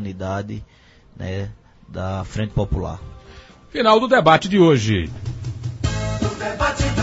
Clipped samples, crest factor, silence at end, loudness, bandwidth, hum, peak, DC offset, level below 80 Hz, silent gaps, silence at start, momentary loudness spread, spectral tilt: under 0.1%; 18 dB; 0 s; -20 LUFS; 8 kHz; none; -2 dBFS; under 0.1%; -34 dBFS; none; 0 s; 19 LU; -6 dB/octave